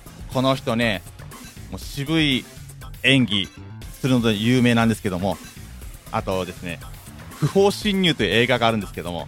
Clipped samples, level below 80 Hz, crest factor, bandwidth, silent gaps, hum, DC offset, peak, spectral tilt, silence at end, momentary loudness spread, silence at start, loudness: under 0.1%; -42 dBFS; 20 dB; 17 kHz; none; none; under 0.1%; -2 dBFS; -5 dB/octave; 0 s; 21 LU; 0 s; -21 LUFS